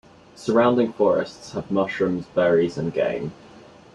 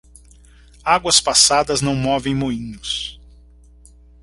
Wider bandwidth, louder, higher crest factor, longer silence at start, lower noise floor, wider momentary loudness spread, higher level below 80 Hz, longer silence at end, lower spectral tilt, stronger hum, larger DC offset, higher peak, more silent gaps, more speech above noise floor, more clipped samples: about the same, 10.5 kHz vs 11.5 kHz; second, -22 LUFS vs -17 LUFS; about the same, 16 dB vs 20 dB; second, 0.4 s vs 0.85 s; about the same, -47 dBFS vs -47 dBFS; about the same, 12 LU vs 14 LU; second, -58 dBFS vs -44 dBFS; second, 0.35 s vs 1.05 s; first, -7 dB/octave vs -2.5 dB/octave; second, none vs 60 Hz at -40 dBFS; neither; second, -6 dBFS vs 0 dBFS; neither; second, 25 dB vs 29 dB; neither